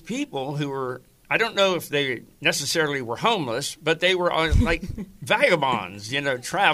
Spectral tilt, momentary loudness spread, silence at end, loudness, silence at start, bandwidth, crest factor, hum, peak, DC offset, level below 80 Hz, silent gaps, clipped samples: -4 dB/octave; 9 LU; 0 s; -23 LUFS; 0.05 s; 15.5 kHz; 20 dB; none; -4 dBFS; under 0.1%; -36 dBFS; none; under 0.1%